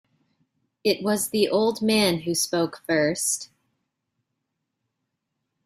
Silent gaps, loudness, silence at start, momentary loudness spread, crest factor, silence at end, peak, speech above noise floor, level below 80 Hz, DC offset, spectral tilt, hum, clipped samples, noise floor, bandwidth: none; -23 LUFS; 0.85 s; 6 LU; 20 dB; 2.2 s; -8 dBFS; 57 dB; -66 dBFS; under 0.1%; -3.5 dB/octave; none; under 0.1%; -80 dBFS; 16 kHz